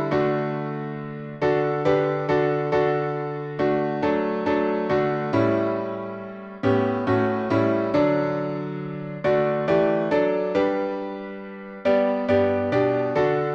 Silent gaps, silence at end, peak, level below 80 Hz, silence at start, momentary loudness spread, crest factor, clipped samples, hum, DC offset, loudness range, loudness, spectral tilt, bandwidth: none; 0 s; -8 dBFS; -56 dBFS; 0 s; 10 LU; 16 dB; under 0.1%; none; under 0.1%; 1 LU; -23 LUFS; -8.5 dB/octave; 7 kHz